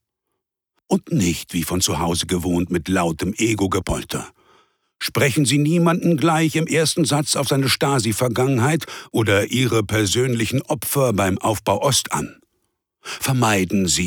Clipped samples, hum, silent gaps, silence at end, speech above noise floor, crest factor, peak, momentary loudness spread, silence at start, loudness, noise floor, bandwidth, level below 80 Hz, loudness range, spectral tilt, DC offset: under 0.1%; none; none; 0 s; 60 dB; 16 dB; -4 dBFS; 7 LU; 0.9 s; -19 LUFS; -79 dBFS; over 20 kHz; -44 dBFS; 4 LU; -4.5 dB/octave; under 0.1%